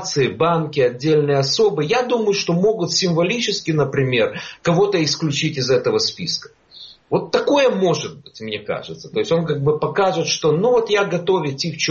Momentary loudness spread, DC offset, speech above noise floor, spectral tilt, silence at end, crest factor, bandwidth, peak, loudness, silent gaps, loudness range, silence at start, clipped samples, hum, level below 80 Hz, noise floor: 9 LU; under 0.1%; 24 dB; -4 dB/octave; 0 s; 16 dB; 7.6 kHz; -2 dBFS; -18 LUFS; none; 3 LU; 0 s; under 0.1%; none; -56 dBFS; -43 dBFS